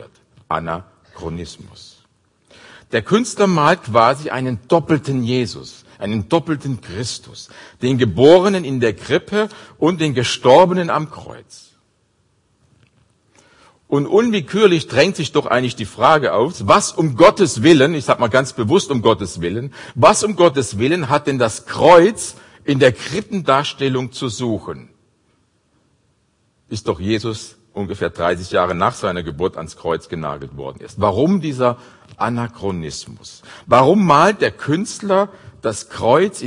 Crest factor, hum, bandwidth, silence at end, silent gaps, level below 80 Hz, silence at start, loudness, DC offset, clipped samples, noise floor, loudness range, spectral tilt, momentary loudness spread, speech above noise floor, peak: 18 dB; none; 11 kHz; 0 s; none; -52 dBFS; 0 s; -16 LUFS; under 0.1%; under 0.1%; -62 dBFS; 9 LU; -5 dB/octave; 17 LU; 46 dB; 0 dBFS